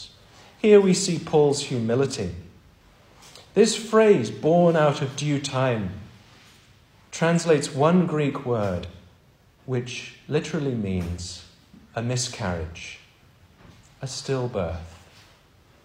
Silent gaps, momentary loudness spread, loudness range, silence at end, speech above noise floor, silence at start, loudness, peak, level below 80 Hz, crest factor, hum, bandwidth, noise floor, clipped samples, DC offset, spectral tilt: none; 18 LU; 10 LU; 0.9 s; 34 dB; 0 s; -23 LUFS; -4 dBFS; -52 dBFS; 20 dB; none; 15 kHz; -57 dBFS; under 0.1%; under 0.1%; -5.5 dB/octave